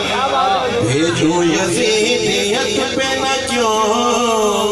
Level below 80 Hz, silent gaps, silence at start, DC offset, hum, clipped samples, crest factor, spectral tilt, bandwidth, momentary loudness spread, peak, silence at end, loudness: -44 dBFS; none; 0 s; under 0.1%; none; under 0.1%; 10 dB; -3.5 dB/octave; 13.5 kHz; 2 LU; -4 dBFS; 0 s; -15 LUFS